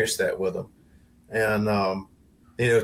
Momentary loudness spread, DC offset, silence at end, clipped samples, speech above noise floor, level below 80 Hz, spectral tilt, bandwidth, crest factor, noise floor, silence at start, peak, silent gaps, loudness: 14 LU; under 0.1%; 0 s; under 0.1%; 31 dB; -56 dBFS; -4.5 dB/octave; 16.5 kHz; 16 dB; -56 dBFS; 0 s; -10 dBFS; none; -26 LUFS